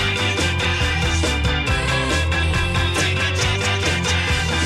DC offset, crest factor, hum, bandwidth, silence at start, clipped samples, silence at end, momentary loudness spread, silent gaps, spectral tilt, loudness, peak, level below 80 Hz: under 0.1%; 12 dB; none; 13.5 kHz; 0 s; under 0.1%; 0 s; 1 LU; none; -4 dB/octave; -19 LUFS; -6 dBFS; -30 dBFS